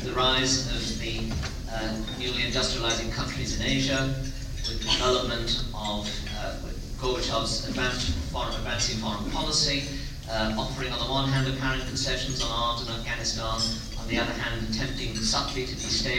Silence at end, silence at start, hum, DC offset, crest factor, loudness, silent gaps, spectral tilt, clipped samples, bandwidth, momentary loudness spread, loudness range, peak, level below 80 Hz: 0 s; 0 s; none; under 0.1%; 18 dB; -28 LUFS; none; -3.5 dB/octave; under 0.1%; 16 kHz; 9 LU; 2 LU; -10 dBFS; -36 dBFS